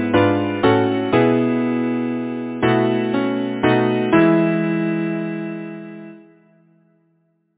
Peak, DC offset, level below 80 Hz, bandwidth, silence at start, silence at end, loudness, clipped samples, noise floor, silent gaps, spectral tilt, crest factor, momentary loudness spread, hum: -2 dBFS; under 0.1%; -52 dBFS; 4 kHz; 0 s; 1.4 s; -18 LUFS; under 0.1%; -64 dBFS; none; -11 dB/octave; 18 dB; 12 LU; none